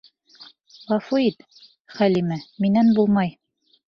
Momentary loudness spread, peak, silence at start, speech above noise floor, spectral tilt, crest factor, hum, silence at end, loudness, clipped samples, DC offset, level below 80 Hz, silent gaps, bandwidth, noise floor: 10 LU; -8 dBFS; 0.4 s; 30 dB; -8 dB/octave; 16 dB; none; 0.6 s; -21 LUFS; under 0.1%; under 0.1%; -62 dBFS; 1.80-1.85 s; 6.6 kHz; -49 dBFS